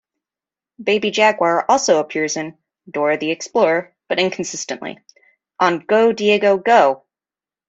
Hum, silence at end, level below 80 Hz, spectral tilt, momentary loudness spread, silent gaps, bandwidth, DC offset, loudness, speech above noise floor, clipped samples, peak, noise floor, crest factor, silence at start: none; 0.75 s; -66 dBFS; -3.5 dB/octave; 12 LU; none; 8 kHz; under 0.1%; -17 LUFS; over 73 dB; under 0.1%; -2 dBFS; under -90 dBFS; 18 dB; 0.8 s